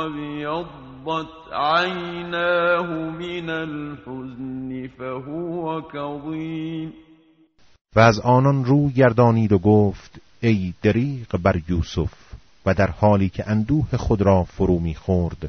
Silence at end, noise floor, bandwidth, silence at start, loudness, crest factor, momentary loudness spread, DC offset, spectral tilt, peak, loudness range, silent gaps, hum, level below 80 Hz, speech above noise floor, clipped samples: 0 s; -55 dBFS; 6.6 kHz; 0 s; -21 LUFS; 20 dB; 15 LU; under 0.1%; -6.5 dB/octave; -2 dBFS; 11 LU; 7.81-7.85 s; none; -40 dBFS; 35 dB; under 0.1%